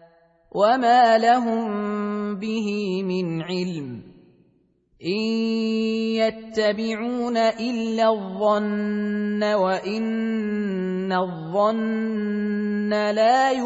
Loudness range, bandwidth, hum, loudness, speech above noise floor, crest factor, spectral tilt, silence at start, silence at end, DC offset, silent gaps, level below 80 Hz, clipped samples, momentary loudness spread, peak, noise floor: 6 LU; 8 kHz; none; -23 LUFS; 41 dB; 18 dB; -6 dB/octave; 0.55 s; 0 s; under 0.1%; none; -64 dBFS; under 0.1%; 9 LU; -6 dBFS; -63 dBFS